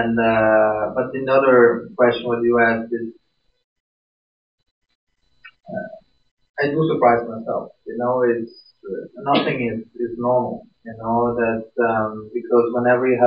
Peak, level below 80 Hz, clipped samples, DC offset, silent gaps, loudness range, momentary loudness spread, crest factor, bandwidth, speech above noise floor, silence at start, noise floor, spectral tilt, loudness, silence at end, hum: -2 dBFS; -56 dBFS; under 0.1%; under 0.1%; 3.64-4.58 s, 4.71-4.82 s, 4.95-5.07 s, 6.31-6.37 s, 6.49-6.54 s; 14 LU; 16 LU; 18 dB; 5.4 kHz; 31 dB; 0 s; -50 dBFS; -10 dB/octave; -19 LUFS; 0 s; none